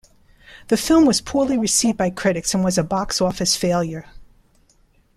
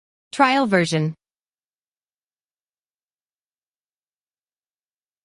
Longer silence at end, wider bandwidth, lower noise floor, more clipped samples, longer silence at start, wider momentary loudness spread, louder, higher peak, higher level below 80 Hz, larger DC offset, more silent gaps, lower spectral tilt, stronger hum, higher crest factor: second, 0.9 s vs 4.1 s; first, 15.5 kHz vs 11.5 kHz; second, -58 dBFS vs under -90 dBFS; neither; first, 0.5 s vs 0.35 s; second, 8 LU vs 11 LU; about the same, -19 LUFS vs -19 LUFS; about the same, -4 dBFS vs -4 dBFS; first, -46 dBFS vs -68 dBFS; neither; neither; second, -4 dB/octave vs -5.5 dB/octave; neither; second, 16 dB vs 22 dB